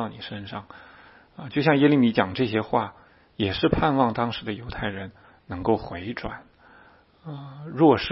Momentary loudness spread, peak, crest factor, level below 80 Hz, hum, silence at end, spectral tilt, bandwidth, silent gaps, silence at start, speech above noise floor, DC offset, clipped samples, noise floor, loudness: 20 LU; -4 dBFS; 22 dB; -48 dBFS; none; 0 s; -10.5 dB/octave; 5.8 kHz; none; 0 s; 31 dB; under 0.1%; under 0.1%; -54 dBFS; -24 LUFS